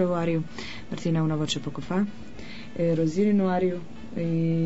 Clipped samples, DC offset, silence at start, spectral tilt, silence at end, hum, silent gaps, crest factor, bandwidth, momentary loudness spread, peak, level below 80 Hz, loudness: under 0.1%; 1%; 0 s; -7 dB/octave; 0 s; none; none; 14 dB; 8 kHz; 15 LU; -14 dBFS; -54 dBFS; -27 LUFS